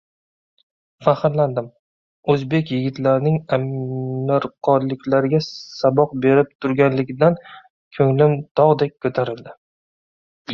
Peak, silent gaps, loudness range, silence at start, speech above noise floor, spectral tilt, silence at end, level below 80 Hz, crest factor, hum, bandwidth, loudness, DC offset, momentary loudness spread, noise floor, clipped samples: -2 dBFS; 1.79-2.23 s, 6.55-6.59 s, 7.70-7.91 s, 8.51-8.55 s, 9.58-10.45 s; 3 LU; 1 s; over 72 dB; -8.5 dB/octave; 0 s; -58 dBFS; 18 dB; none; 6.8 kHz; -19 LUFS; under 0.1%; 10 LU; under -90 dBFS; under 0.1%